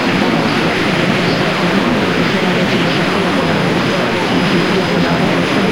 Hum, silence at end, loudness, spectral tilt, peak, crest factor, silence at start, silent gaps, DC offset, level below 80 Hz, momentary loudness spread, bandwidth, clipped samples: none; 0 s; -13 LUFS; -5.5 dB/octave; 0 dBFS; 12 dB; 0 s; none; 1%; -42 dBFS; 1 LU; 16 kHz; under 0.1%